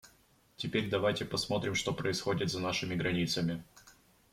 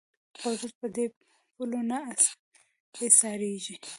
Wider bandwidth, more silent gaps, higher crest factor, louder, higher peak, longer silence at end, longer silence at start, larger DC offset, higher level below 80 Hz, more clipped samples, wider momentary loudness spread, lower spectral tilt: first, 16 kHz vs 12 kHz; second, none vs 0.75-0.81 s, 1.17-1.21 s, 2.39-2.51 s, 2.80-2.93 s; second, 18 dB vs 26 dB; second, -33 LUFS vs -26 LUFS; second, -16 dBFS vs -4 dBFS; first, 0.4 s vs 0 s; second, 0.05 s vs 0.4 s; neither; first, -62 dBFS vs -80 dBFS; neither; second, 3 LU vs 16 LU; first, -4.5 dB/octave vs -2 dB/octave